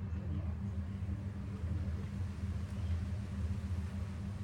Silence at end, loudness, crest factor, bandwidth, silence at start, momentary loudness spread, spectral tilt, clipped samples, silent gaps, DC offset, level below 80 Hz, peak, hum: 0 s; -40 LUFS; 12 dB; 10 kHz; 0 s; 3 LU; -8 dB/octave; under 0.1%; none; under 0.1%; -48 dBFS; -28 dBFS; none